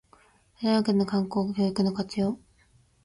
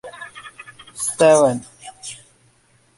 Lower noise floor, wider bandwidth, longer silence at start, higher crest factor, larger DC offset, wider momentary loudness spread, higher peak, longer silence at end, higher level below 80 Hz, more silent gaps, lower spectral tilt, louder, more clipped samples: first, -62 dBFS vs -58 dBFS; about the same, 11.5 kHz vs 11.5 kHz; first, 0.6 s vs 0.05 s; about the same, 16 dB vs 20 dB; neither; second, 7 LU vs 26 LU; second, -12 dBFS vs -2 dBFS; second, 0.65 s vs 0.85 s; about the same, -62 dBFS vs -62 dBFS; neither; first, -7 dB/octave vs -4 dB/octave; second, -27 LUFS vs -16 LUFS; neither